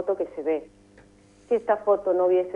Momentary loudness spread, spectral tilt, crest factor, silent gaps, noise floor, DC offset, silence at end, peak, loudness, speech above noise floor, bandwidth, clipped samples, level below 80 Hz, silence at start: 7 LU; -7 dB/octave; 16 dB; none; -54 dBFS; under 0.1%; 0 s; -10 dBFS; -25 LUFS; 31 dB; 7 kHz; under 0.1%; -64 dBFS; 0 s